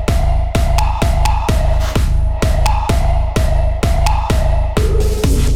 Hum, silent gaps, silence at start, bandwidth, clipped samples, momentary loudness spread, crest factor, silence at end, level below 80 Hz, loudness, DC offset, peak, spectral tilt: none; none; 0 s; 15.5 kHz; under 0.1%; 1 LU; 10 dB; 0 s; -14 dBFS; -16 LUFS; under 0.1%; -4 dBFS; -5.5 dB/octave